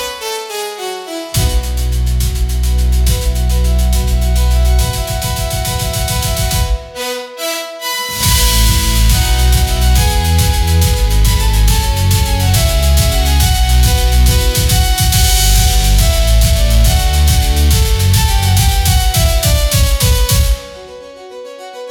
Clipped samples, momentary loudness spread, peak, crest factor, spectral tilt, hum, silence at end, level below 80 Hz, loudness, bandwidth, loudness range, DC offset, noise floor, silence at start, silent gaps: under 0.1%; 9 LU; 0 dBFS; 12 dB; -3.5 dB/octave; none; 0 s; -14 dBFS; -13 LUFS; 18.5 kHz; 4 LU; under 0.1%; -31 dBFS; 0 s; none